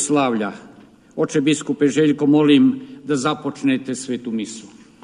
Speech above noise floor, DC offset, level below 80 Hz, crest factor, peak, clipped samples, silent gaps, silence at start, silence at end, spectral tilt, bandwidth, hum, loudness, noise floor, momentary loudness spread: 24 dB; under 0.1%; -64 dBFS; 16 dB; -4 dBFS; under 0.1%; none; 0 s; 0.4 s; -5 dB/octave; 11 kHz; none; -19 LUFS; -43 dBFS; 15 LU